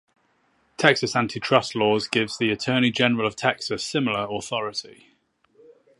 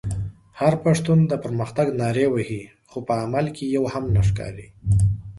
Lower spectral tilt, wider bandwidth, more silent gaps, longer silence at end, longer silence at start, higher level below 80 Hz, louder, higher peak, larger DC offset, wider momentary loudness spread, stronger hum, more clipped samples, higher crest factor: second, -4.5 dB/octave vs -7.5 dB/octave; about the same, 11.5 kHz vs 11.5 kHz; neither; first, 1.05 s vs 0 s; first, 0.8 s vs 0.05 s; second, -62 dBFS vs -38 dBFS; about the same, -23 LUFS vs -22 LUFS; first, 0 dBFS vs -4 dBFS; neither; second, 8 LU vs 14 LU; neither; neither; first, 24 dB vs 18 dB